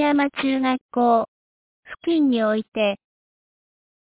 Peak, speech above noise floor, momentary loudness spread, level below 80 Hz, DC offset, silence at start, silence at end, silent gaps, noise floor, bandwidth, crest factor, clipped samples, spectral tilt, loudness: -8 dBFS; over 70 dB; 12 LU; -64 dBFS; under 0.1%; 0 s; 1.05 s; 0.81-0.89 s, 1.28-1.83 s, 2.68-2.72 s; under -90 dBFS; 4 kHz; 14 dB; under 0.1%; -9 dB/octave; -21 LUFS